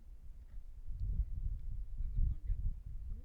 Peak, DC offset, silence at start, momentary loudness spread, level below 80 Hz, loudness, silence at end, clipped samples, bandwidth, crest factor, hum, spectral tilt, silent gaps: -22 dBFS; under 0.1%; 0 s; 16 LU; -40 dBFS; -44 LUFS; 0 s; under 0.1%; 0.9 kHz; 16 dB; none; -9.5 dB/octave; none